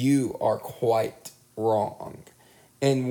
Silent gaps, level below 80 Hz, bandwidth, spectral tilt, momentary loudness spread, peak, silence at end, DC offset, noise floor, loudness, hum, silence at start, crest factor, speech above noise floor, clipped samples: none; -66 dBFS; 19 kHz; -6.5 dB/octave; 17 LU; -10 dBFS; 0 s; under 0.1%; -57 dBFS; -26 LUFS; none; 0 s; 16 dB; 31 dB; under 0.1%